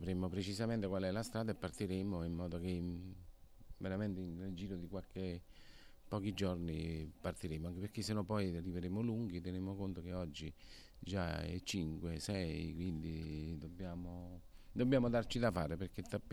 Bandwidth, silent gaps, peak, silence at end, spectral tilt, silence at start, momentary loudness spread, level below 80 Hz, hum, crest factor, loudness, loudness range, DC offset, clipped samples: 17.5 kHz; none; -22 dBFS; 0 s; -6.5 dB/octave; 0 s; 11 LU; -56 dBFS; none; 18 dB; -42 LUFS; 4 LU; under 0.1%; under 0.1%